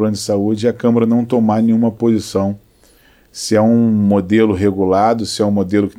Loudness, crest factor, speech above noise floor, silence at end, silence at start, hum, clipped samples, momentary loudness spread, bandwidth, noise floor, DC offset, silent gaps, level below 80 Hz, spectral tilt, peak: -15 LUFS; 14 dB; 36 dB; 0.1 s; 0 s; none; under 0.1%; 6 LU; 13.5 kHz; -50 dBFS; under 0.1%; none; -52 dBFS; -6.5 dB/octave; -2 dBFS